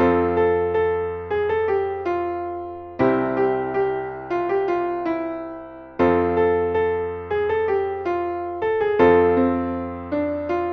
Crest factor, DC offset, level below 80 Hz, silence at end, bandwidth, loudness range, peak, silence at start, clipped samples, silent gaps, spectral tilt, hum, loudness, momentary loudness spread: 18 dB; under 0.1%; -48 dBFS; 0 s; 5.8 kHz; 3 LU; -4 dBFS; 0 s; under 0.1%; none; -9 dB/octave; none; -22 LUFS; 10 LU